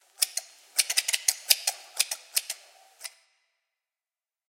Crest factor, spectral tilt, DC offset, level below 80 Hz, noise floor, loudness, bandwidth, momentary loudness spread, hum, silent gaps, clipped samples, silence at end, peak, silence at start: 30 dB; 7 dB/octave; under 0.1%; under -90 dBFS; under -90 dBFS; -26 LUFS; 17 kHz; 19 LU; none; none; under 0.1%; 1.4 s; -2 dBFS; 0.2 s